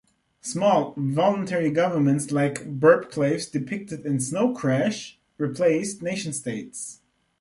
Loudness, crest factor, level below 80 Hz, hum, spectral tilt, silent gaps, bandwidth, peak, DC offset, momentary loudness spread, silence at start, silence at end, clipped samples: -24 LUFS; 20 dB; -66 dBFS; none; -5.5 dB/octave; none; 11.5 kHz; -4 dBFS; under 0.1%; 12 LU; 0.45 s; 0.5 s; under 0.1%